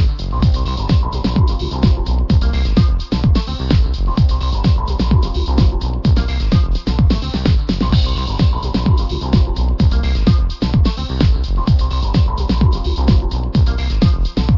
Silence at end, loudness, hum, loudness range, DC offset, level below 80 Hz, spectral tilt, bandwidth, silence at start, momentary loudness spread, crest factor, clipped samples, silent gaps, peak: 0 s; -16 LUFS; none; 0 LU; under 0.1%; -16 dBFS; -8 dB/octave; 6 kHz; 0 s; 2 LU; 14 dB; under 0.1%; none; 0 dBFS